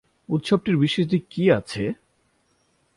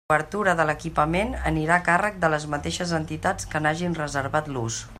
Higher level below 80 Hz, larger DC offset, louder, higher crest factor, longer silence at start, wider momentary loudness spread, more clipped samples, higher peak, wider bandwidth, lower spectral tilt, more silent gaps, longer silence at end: second, -56 dBFS vs -42 dBFS; neither; about the same, -23 LUFS vs -24 LUFS; about the same, 20 dB vs 20 dB; first, 0.3 s vs 0.1 s; about the same, 8 LU vs 6 LU; neither; about the same, -4 dBFS vs -4 dBFS; second, 11.5 kHz vs 14 kHz; first, -7 dB/octave vs -5 dB/octave; neither; first, 1.05 s vs 0 s